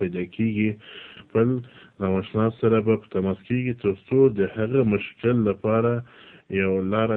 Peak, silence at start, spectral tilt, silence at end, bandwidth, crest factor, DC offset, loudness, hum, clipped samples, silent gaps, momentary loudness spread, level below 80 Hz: -8 dBFS; 0 s; -11 dB/octave; 0 s; 4.1 kHz; 16 dB; under 0.1%; -24 LUFS; none; under 0.1%; none; 9 LU; -56 dBFS